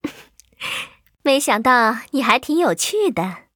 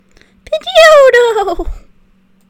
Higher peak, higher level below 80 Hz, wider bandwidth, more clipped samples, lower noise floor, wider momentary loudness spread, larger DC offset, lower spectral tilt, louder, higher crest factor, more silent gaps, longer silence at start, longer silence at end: about the same, 0 dBFS vs 0 dBFS; second, -60 dBFS vs -30 dBFS; about the same, over 20 kHz vs 19 kHz; second, under 0.1% vs 3%; about the same, -47 dBFS vs -49 dBFS; second, 13 LU vs 18 LU; neither; about the same, -3 dB/octave vs -2 dB/octave; second, -18 LUFS vs -7 LUFS; first, 20 dB vs 10 dB; neither; second, 0.05 s vs 0.5 s; second, 0.15 s vs 0.7 s